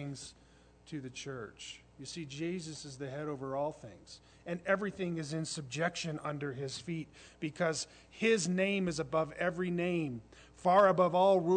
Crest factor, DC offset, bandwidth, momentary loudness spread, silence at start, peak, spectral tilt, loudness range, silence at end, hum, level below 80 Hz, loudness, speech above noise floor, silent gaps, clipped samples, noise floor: 20 dB; under 0.1%; 9.4 kHz; 20 LU; 0 s; -14 dBFS; -5 dB/octave; 10 LU; 0 s; none; -66 dBFS; -34 LUFS; 28 dB; none; under 0.1%; -62 dBFS